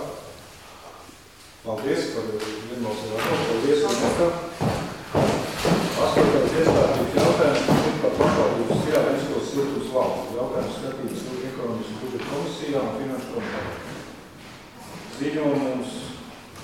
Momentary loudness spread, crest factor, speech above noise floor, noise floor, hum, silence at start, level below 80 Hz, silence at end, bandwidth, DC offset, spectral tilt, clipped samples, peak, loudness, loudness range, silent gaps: 20 LU; 20 dB; 23 dB; -47 dBFS; none; 0 s; -48 dBFS; 0 s; 17 kHz; under 0.1%; -5.5 dB/octave; under 0.1%; -4 dBFS; -24 LUFS; 10 LU; none